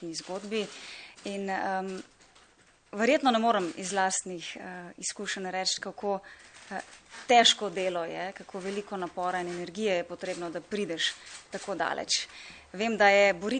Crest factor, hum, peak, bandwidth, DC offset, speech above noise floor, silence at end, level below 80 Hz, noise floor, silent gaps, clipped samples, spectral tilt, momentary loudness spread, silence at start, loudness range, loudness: 22 dB; none; -8 dBFS; 9.6 kHz; under 0.1%; 32 dB; 0 s; -70 dBFS; -62 dBFS; none; under 0.1%; -2.5 dB/octave; 18 LU; 0 s; 5 LU; -29 LUFS